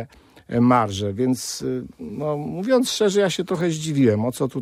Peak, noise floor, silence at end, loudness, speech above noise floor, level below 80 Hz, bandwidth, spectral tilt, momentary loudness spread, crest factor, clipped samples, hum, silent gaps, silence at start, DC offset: -4 dBFS; -41 dBFS; 0 s; -22 LUFS; 20 dB; -58 dBFS; 15.5 kHz; -5.5 dB/octave; 10 LU; 18 dB; under 0.1%; none; none; 0 s; under 0.1%